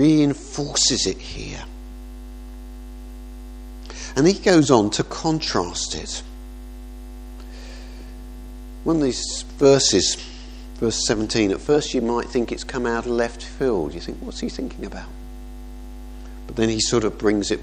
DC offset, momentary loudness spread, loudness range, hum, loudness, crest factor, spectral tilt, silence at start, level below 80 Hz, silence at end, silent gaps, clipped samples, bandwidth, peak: under 0.1%; 23 LU; 9 LU; 50 Hz at -35 dBFS; -21 LUFS; 22 dB; -4 dB/octave; 0 s; -36 dBFS; 0 s; none; under 0.1%; 14.5 kHz; 0 dBFS